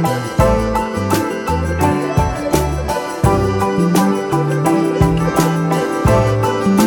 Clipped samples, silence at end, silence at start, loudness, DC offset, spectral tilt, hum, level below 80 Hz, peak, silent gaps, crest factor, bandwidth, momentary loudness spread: under 0.1%; 0 s; 0 s; -16 LUFS; under 0.1%; -6.5 dB/octave; none; -28 dBFS; 0 dBFS; none; 14 dB; 18.5 kHz; 4 LU